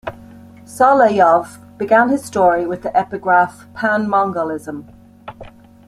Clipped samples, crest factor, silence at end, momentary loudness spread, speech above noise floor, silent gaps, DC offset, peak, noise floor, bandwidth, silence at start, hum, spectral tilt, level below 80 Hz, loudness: under 0.1%; 16 dB; 0.4 s; 21 LU; 24 dB; none; under 0.1%; -2 dBFS; -40 dBFS; 14 kHz; 0.05 s; none; -6 dB/octave; -52 dBFS; -15 LUFS